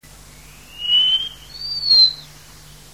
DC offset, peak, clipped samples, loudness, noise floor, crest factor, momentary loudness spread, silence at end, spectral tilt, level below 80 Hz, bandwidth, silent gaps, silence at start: 0.3%; -4 dBFS; under 0.1%; -14 LUFS; -43 dBFS; 16 dB; 18 LU; 0.7 s; -0.5 dB/octave; -50 dBFS; 16 kHz; none; 0.75 s